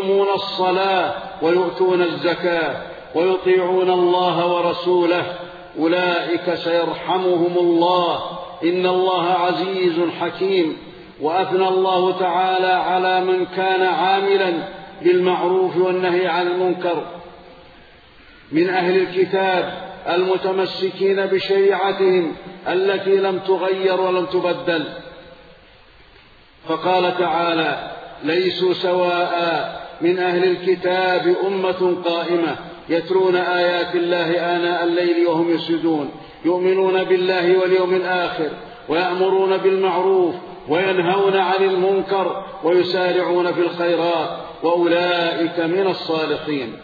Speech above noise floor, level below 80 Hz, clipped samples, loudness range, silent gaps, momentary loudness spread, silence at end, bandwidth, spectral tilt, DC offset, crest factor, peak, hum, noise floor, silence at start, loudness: 30 dB; -60 dBFS; under 0.1%; 3 LU; none; 7 LU; 0 s; 4.9 kHz; -7.5 dB/octave; under 0.1%; 14 dB; -4 dBFS; none; -48 dBFS; 0 s; -19 LUFS